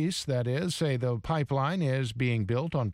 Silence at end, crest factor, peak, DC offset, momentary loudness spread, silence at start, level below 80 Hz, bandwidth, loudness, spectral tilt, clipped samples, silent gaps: 0 s; 12 dB; -16 dBFS; under 0.1%; 2 LU; 0 s; -54 dBFS; 13.5 kHz; -29 LUFS; -6 dB/octave; under 0.1%; none